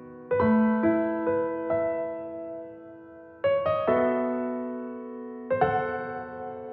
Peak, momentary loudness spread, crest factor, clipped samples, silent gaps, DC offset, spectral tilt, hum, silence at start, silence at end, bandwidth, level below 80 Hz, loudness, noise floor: -10 dBFS; 16 LU; 18 dB; under 0.1%; none; under 0.1%; -6 dB/octave; none; 0 s; 0 s; 4.7 kHz; -60 dBFS; -27 LUFS; -47 dBFS